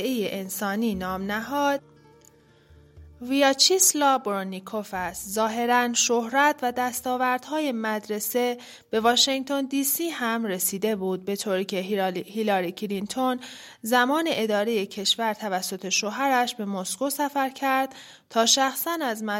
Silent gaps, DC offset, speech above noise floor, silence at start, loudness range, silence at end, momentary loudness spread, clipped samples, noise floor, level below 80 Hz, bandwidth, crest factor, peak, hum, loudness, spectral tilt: none; under 0.1%; 31 dB; 0 s; 4 LU; 0 s; 10 LU; under 0.1%; -56 dBFS; -62 dBFS; 16.5 kHz; 20 dB; -6 dBFS; none; -24 LUFS; -2 dB/octave